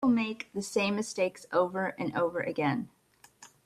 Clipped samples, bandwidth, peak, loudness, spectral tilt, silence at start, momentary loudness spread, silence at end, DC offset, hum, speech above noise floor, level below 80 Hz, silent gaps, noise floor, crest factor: under 0.1%; 13.5 kHz; -14 dBFS; -31 LUFS; -5 dB/octave; 0 s; 6 LU; 0.2 s; under 0.1%; none; 27 dB; -70 dBFS; none; -58 dBFS; 16 dB